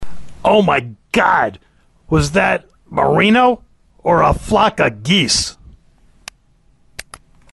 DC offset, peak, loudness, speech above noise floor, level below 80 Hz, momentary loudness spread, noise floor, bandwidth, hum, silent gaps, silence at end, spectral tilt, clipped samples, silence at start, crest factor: under 0.1%; -2 dBFS; -15 LUFS; 40 dB; -36 dBFS; 12 LU; -53 dBFS; 11.5 kHz; none; none; 0.35 s; -4.5 dB/octave; under 0.1%; 0 s; 14 dB